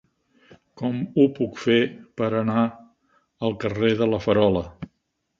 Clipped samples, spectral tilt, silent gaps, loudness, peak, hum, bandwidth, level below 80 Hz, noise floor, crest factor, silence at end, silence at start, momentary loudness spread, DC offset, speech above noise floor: under 0.1%; -7.5 dB/octave; none; -23 LUFS; -4 dBFS; none; 7.4 kHz; -52 dBFS; -74 dBFS; 20 dB; 0.55 s; 0.75 s; 9 LU; under 0.1%; 53 dB